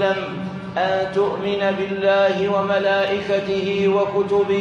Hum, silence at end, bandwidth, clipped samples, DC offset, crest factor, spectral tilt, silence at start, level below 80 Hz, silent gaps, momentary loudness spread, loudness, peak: none; 0 s; 7.6 kHz; under 0.1%; under 0.1%; 14 dB; -6 dB/octave; 0 s; -58 dBFS; none; 5 LU; -20 LUFS; -6 dBFS